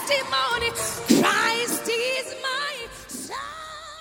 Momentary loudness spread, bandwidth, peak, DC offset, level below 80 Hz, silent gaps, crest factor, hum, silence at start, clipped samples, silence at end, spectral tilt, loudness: 15 LU; 18 kHz; -4 dBFS; under 0.1%; -54 dBFS; none; 22 dB; none; 0 s; under 0.1%; 0 s; -2 dB/octave; -23 LUFS